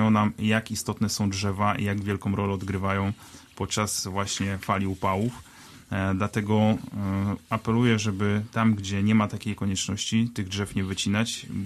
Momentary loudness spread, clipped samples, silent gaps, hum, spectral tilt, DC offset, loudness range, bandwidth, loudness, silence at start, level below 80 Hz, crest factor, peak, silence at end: 7 LU; under 0.1%; none; none; -5 dB/octave; under 0.1%; 3 LU; 13.5 kHz; -26 LUFS; 0 s; -54 dBFS; 18 dB; -8 dBFS; 0 s